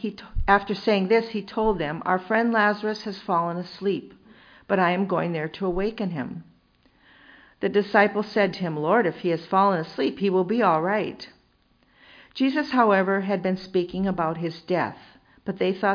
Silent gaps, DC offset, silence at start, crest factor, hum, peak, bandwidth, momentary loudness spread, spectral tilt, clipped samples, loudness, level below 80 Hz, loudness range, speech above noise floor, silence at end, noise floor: none; under 0.1%; 0 s; 20 dB; none; -4 dBFS; 5.2 kHz; 10 LU; -7.5 dB/octave; under 0.1%; -24 LUFS; -44 dBFS; 4 LU; 39 dB; 0 s; -63 dBFS